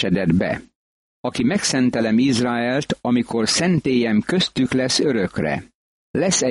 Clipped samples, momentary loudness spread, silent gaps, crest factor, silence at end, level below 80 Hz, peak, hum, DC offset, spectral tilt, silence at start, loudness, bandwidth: under 0.1%; 7 LU; 0.75-1.24 s, 5.75-6.14 s; 14 dB; 0 s; -50 dBFS; -6 dBFS; none; under 0.1%; -4.5 dB/octave; 0 s; -20 LUFS; 11.5 kHz